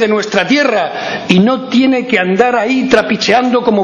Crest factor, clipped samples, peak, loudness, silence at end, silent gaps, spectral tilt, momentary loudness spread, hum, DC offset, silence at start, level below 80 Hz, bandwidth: 12 dB; 0.3%; 0 dBFS; -11 LUFS; 0 s; none; -5 dB/octave; 3 LU; none; under 0.1%; 0 s; -48 dBFS; 9.2 kHz